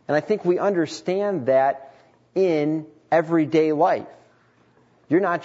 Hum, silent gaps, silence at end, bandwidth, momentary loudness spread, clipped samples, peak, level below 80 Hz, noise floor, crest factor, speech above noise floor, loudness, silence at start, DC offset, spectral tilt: none; none; 0 s; 8 kHz; 6 LU; under 0.1%; -6 dBFS; -74 dBFS; -58 dBFS; 16 dB; 38 dB; -22 LUFS; 0.1 s; under 0.1%; -7 dB/octave